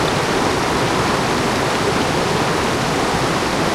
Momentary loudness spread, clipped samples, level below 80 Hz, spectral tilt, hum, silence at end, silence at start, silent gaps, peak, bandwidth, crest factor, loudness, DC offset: 1 LU; under 0.1%; -38 dBFS; -4 dB/octave; none; 0 s; 0 s; none; -4 dBFS; 16.5 kHz; 12 dB; -17 LUFS; under 0.1%